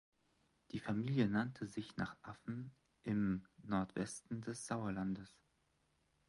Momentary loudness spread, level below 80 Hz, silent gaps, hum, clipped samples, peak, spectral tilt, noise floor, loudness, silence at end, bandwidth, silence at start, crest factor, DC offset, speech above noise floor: 13 LU; -68 dBFS; none; none; under 0.1%; -22 dBFS; -6 dB/octave; -79 dBFS; -42 LUFS; 1 s; 11.5 kHz; 0.75 s; 20 dB; under 0.1%; 38 dB